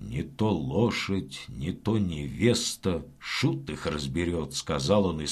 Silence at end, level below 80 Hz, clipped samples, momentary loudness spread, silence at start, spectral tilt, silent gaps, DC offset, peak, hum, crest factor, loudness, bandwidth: 0 s; -46 dBFS; under 0.1%; 8 LU; 0 s; -5 dB/octave; none; under 0.1%; -10 dBFS; none; 18 dB; -28 LUFS; 14.5 kHz